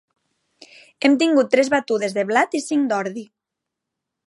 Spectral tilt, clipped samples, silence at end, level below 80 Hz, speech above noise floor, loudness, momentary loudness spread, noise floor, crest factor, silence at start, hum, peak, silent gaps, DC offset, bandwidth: -4 dB/octave; under 0.1%; 1.05 s; -76 dBFS; 64 dB; -19 LUFS; 7 LU; -83 dBFS; 20 dB; 1 s; none; -2 dBFS; none; under 0.1%; 11.5 kHz